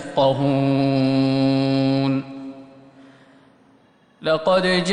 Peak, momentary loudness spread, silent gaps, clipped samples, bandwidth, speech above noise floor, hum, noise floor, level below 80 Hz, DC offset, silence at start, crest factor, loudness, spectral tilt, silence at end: -6 dBFS; 10 LU; none; under 0.1%; 10 kHz; 38 dB; none; -55 dBFS; -56 dBFS; under 0.1%; 0 s; 14 dB; -19 LUFS; -6.5 dB/octave; 0 s